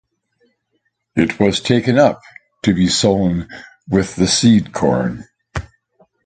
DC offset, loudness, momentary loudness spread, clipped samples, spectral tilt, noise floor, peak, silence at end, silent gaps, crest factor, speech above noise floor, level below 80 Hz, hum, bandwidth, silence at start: under 0.1%; -16 LUFS; 17 LU; under 0.1%; -5 dB/octave; -69 dBFS; 0 dBFS; 0.65 s; none; 18 dB; 54 dB; -40 dBFS; none; 9.4 kHz; 1.15 s